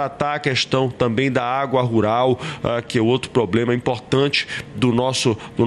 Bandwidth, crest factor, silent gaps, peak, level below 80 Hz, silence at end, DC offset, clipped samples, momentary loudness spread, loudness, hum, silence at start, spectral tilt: 12 kHz; 14 dB; none; -4 dBFS; -50 dBFS; 0 s; under 0.1%; under 0.1%; 4 LU; -20 LUFS; none; 0 s; -5.5 dB/octave